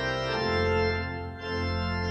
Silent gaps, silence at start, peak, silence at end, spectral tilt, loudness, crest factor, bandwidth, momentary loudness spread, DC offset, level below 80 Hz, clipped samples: none; 0 s; -14 dBFS; 0 s; -6 dB/octave; -29 LUFS; 14 dB; 8.4 kHz; 8 LU; under 0.1%; -42 dBFS; under 0.1%